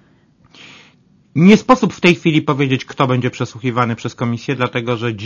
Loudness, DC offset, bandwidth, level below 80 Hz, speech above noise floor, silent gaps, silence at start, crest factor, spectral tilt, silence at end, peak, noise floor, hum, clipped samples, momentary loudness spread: -15 LUFS; under 0.1%; 7.4 kHz; -50 dBFS; 37 dB; none; 1.35 s; 16 dB; -6.5 dB/octave; 0 s; 0 dBFS; -52 dBFS; none; 0.1%; 11 LU